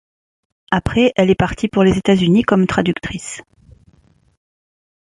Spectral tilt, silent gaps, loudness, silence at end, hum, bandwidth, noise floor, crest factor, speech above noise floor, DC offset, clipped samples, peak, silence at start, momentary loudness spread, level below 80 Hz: -6 dB/octave; none; -15 LUFS; 1.6 s; none; 11 kHz; -53 dBFS; 16 dB; 38 dB; under 0.1%; under 0.1%; -2 dBFS; 0.7 s; 13 LU; -38 dBFS